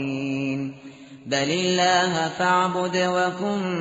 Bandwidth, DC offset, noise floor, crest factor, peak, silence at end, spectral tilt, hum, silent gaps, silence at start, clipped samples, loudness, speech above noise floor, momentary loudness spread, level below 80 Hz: 8 kHz; under 0.1%; -43 dBFS; 16 dB; -8 dBFS; 0 s; -3 dB/octave; none; none; 0 s; under 0.1%; -22 LUFS; 21 dB; 13 LU; -64 dBFS